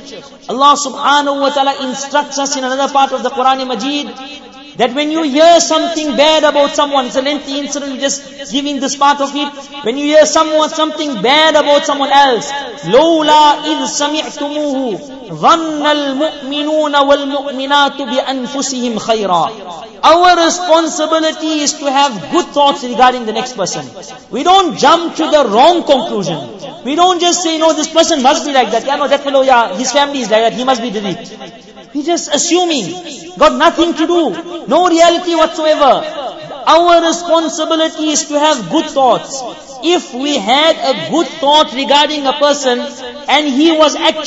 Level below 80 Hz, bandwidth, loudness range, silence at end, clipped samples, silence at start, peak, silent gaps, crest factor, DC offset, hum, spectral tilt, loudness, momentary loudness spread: -50 dBFS; 8 kHz; 3 LU; 0 s; under 0.1%; 0 s; 0 dBFS; none; 12 dB; under 0.1%; none; -2.5 dB/octave; -12 LUFS; 12 LU